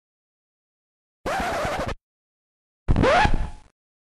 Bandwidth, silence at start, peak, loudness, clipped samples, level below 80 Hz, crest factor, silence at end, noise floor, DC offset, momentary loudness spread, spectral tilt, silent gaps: 13 kHz; 1.25 s; -6 dBFS; -23 LUFS; under 0.1%; -30 dBFS; 18 dB; 0.45 s; under -90 dBFS; under 0.1%; 18 LU; -5.5 dB/octave; 2.01-2.86 s